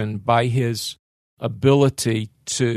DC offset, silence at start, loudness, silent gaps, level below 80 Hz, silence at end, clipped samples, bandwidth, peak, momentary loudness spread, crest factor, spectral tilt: under 0.1%; 0 s; -21 LUFS; 0.99-1.37 s; -52 dBFS; 0 s; under 0.1%; 13.5 kHz; -2 dBFS; 13 LU; 18 dB; -5.5 dB/octave